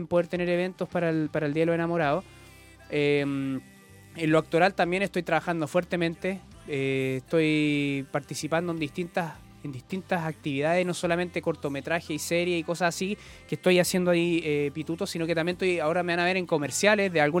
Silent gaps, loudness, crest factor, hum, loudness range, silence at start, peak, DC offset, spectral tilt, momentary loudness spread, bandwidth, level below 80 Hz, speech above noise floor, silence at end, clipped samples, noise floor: none; -27 LUFS; 20 dB; none; 4 LU; 0 s; -6 dBFS; under 0.1%; -5 dB/octave; 9 LU; 17 kHz; -60 dBFS; 24 dB; 0 s; under 0.1%; -51 dBFS